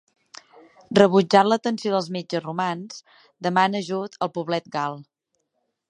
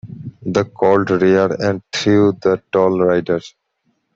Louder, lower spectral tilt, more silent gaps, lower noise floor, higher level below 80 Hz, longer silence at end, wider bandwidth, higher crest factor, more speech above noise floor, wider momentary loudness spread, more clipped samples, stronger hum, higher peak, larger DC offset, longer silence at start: second, -22 LUFS vs -16 LUFS; about the same, -5.5 dB/octave vs -6.5 dB/octave; neither; first, -75 dBFS vs -67 dBFS; second, -68 dBFS vs -54 dBFS; first, 0.85 s vs 0.65 s; first, 9.8 kHz vs 7.8 kHz; first, 22 dB vs 14 dB; about the same, 53 dB vs 52 dB; first, 13 LU vs 8 LU; neither; neither; about the same, -2 dBFS vs -2 dBFS; neither; first, 0.9 s vs 0.05 s